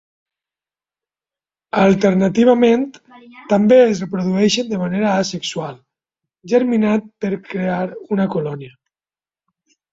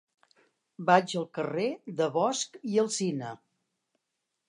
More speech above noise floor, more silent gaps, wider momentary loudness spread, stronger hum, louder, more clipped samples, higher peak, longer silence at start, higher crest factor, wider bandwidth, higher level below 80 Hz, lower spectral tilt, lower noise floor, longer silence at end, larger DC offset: first, over 74 dB vs 55 dB; neither; about the same, 12 LU vs 10 LU; neither; first, -17 LUFS vs -29 LUFS; neither; first, -2 dBFS vs -8 dBFS; first, 1.75 s vs 0.8 s; second, 16 dB vs 22 dB; second, 7.8 kHz vs 11.5 kHz; first, -58 dBFS vs -84 dBFS; first, -6 dB/octave vs -4 dB/octave; first, under -90 dBFS vs -83 dBFS; about the same, 1.25 s vs 1.15 s; neither